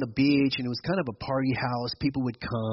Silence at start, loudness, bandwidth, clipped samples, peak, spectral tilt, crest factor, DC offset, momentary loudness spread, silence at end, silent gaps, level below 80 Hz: 0 s; -28 LUFS; 6 kHz; under 0.1%; -12 dBFS; -5 dB/octave; 14 dB; under 0.1%; 8 LU; 0 s; none; -54 dBFS